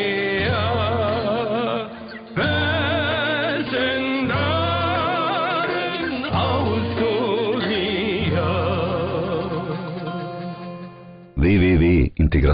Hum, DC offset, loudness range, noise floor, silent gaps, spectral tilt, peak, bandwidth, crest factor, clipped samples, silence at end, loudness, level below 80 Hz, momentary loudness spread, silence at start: none; under 0.1%; 3 LU; -41 dBFS; none; -4.5 dB/octave; -8 dBFS; 5.2 kHz; 12 dB; under 0.1%; 0 s; -21 LUFS; -34 dBFS; 11 LU; 0 s